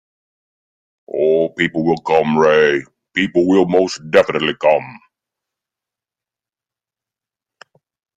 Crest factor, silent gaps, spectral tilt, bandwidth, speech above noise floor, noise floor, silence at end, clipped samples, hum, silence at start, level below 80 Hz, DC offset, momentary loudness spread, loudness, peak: 18 dB; none; -5.5 dB/octave; 9.2 kHz; 74 dB; -89 dBFS; 3.2 s; under 0.1%; none; 1.15 s; -58 dBFS; under 0.1%; 7 LU; -15 LUFS; 0 dBFS